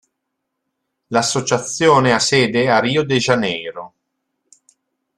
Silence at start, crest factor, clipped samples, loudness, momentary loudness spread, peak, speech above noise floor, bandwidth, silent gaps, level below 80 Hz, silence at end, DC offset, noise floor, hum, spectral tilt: 1.1 s; 18 dB; under 0.1%; -16 LUFS; 9 LU; 0 dBFS; 60 dB; 13 kHz; none; -56 dBFS; 1.3 s; under 0.1%; -76 dBFS; none; -4 dB/octave